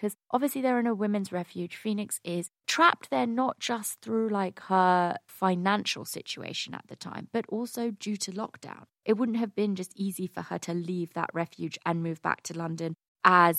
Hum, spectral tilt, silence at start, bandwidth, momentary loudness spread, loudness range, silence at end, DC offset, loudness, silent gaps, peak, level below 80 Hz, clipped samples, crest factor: none; -4.5 dB/octave; 0 s; 16.5 kHz; 13 LU; 6 LU; 0 s; under 0.1%; -29 LUFS; 13.08-13.15 s; -4 dBFS; -80 dBFS; under 0.1%; 24 dB